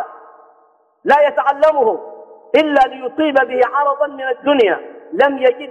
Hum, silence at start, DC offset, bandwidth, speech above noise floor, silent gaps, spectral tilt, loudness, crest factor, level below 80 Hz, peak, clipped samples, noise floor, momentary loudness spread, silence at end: none; 0 s; under 0.1%; 8.8 kHz; 40 dB; none; -5 dB/octave; -15 LUFS; 14 dB; -58 dBFS; -2 dBFS; under 0.1%; -54 dBFS; 12 LU; 0 s